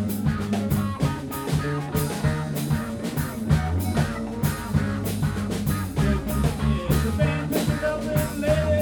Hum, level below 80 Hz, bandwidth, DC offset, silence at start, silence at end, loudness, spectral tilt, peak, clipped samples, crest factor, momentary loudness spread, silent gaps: none; -34 dBFS; over 20 kHz; under 0.1%; 0 s; 0 s; -25 LUFS; -6.5 dB/octave; -8 dBFS; under 0.1%; 16 dB; 4 LU; none